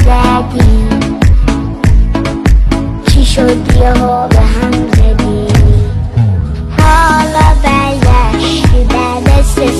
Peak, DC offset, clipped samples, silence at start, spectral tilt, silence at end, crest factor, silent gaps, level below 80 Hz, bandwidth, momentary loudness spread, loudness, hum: 0 dBFS; under 0.1%; 0.7%; 0 s; -6 dB/octave; 0 s; 8 dB; none; -10 dBFS; 12.5 kHz; 5 LU; -10 LUFS; none